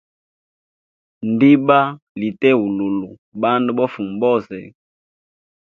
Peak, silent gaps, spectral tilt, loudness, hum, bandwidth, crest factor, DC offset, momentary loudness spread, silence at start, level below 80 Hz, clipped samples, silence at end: 0 dBFS; 2.02-2.15 s, 3.18-3.32 s; -9 dB/octave; -17 LUFS; none; 4.7 kHz; 18 dB; under 0.1%; 14 LU; 1.2 s; -62 dBFS; under 0.1%; 1.1 s